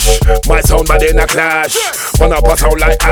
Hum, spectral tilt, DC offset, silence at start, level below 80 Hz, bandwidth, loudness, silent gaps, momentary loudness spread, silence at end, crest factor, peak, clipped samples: none; -3.5 dB/octave; under 0.1%; 0 s; -12 dBFS; 18.5 kHz; -11 LUFS; none; 2 LU; 0 s; 10 dB; 0 dBFS; 0.3%